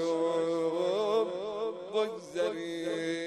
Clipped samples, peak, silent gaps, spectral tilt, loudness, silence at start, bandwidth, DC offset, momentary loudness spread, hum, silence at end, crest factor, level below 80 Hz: under 0.1%; -18 dBFS; none; -5 dB/octave; -32 LUFS; 0 s; 12 kHz; under 0.1%; 6 LU; none; 0 s; 14 dB; -78 dBFS